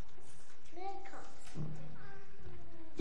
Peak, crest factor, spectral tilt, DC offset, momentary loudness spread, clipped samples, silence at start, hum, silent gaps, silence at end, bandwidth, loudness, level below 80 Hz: -22 dBFS; 24 dB; -6 dB/octave; 3%; 13 LU; under 0.1%; 0 s; none; none; 0 s; 11 kHz; -51 LUFS; -64 dBFS